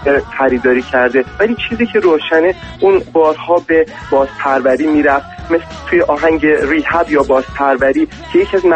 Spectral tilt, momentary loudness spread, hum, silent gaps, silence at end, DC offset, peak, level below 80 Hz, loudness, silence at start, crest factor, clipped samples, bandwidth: -6 dB/octave; 4 LU; none; none; 0 s; under 0.1%; 0 dBFS; -38 dBFS; -13 LUFS; 0 s; 12 dB; under 0.1%; 8.6 kHz